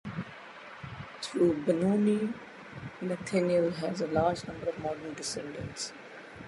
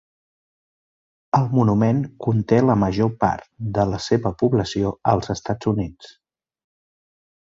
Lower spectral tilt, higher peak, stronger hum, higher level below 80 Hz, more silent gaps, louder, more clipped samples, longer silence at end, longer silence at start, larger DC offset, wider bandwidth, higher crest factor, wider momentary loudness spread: second, -5.5 dB/octave vs -7.5 dB/octave; second, -14 dBFS vs -2 dBFS; neither; second, -60 dBFS vs -46 dBFS; neither; second, -31 LUFS vs -21 LUFS; neither; second, 0 s vs 1.4 s; second, 0.05 s vs 1.35 s; neither; first, 11.5 kHz vs 7.8 kHz; about the same, 18 dB vs 18 dB; first, 17 LU vs 7 LU